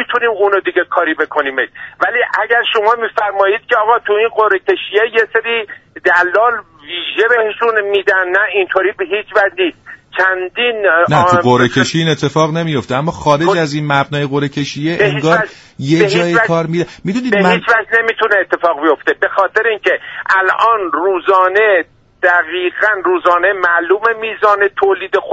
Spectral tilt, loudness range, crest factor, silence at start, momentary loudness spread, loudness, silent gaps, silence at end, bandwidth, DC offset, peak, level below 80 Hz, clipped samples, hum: -5.5 dB/octave; 2 LU; 14 dB; 0 s; 7 LU; -13 LUFS; none; 0 s; 8 kHz; under 0.1%; 0 dBFS; -52 dBFS; under 0.1%; none